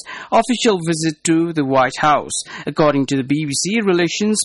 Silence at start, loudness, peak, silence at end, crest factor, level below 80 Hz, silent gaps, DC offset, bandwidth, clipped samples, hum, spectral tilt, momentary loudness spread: 0.05 s; -17 LUFS; -4 dBFS; 0 s; 12 dB; -54 dBFS; none; under 0.1%; 11.5 kHz; under 0.1%; none; -4 dB/octave; 4 LU